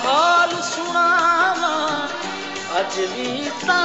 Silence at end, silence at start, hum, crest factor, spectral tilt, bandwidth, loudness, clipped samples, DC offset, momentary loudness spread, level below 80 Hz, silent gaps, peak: 0 s; 0 s; none; 16 dB; -2 dB/octave; 8.2 kHz; -19 LUFS; under 0.1%; 0.3%; 10 LU; -62 dBFS; none; -4 dBFS